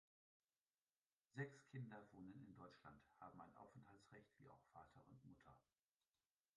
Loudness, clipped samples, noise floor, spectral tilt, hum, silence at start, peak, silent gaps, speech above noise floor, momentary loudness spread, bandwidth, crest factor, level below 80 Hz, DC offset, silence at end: -62 LUFS; under 0.1%; under -90 dBFS; -7 dB/octave; none; 1.35 s; -38 dBFS; none; over 29 dB; 14 LU; 9 kHz; 24 dB; -88 dBFS; under 0.1%; 0.95 s